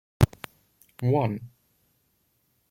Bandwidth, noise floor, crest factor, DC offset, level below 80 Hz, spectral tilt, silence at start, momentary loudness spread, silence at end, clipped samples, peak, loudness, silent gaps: 16.5 kHz; -71 dBFS; 26 dB; under 0.1%; -46 dBFS; -7.5 dB/octave; 0.2 s; 20 LU; 1.25 s; under 0.1%; -4 dBFS; -27 LUFS; none